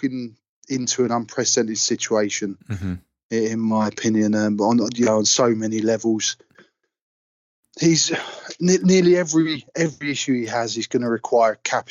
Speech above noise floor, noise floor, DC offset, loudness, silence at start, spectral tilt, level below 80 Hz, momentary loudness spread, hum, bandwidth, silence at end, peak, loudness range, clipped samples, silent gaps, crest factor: 36 dB; -56 dBFS; under 0.1%; -20 LUFS; 0 s; -4 dB/octave; -66 dBFS; 12 LU; none; 8 kHz; 0.1 s; -6 dBFS; 3 LU; under 0.1%; 0.49-0.62 s, 3.23-3.30 s, 7.02-7.63 s; 14 dB